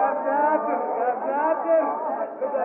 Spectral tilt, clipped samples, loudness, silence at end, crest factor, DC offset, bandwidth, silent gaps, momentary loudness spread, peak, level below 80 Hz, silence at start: -10 dB/octave; under 0.1%; -24 LUFS; 0 s; 14 dB; under 0.1%; 3 kHz; none; 6 LU; -10 dBFS; -86 dBFS; 0 s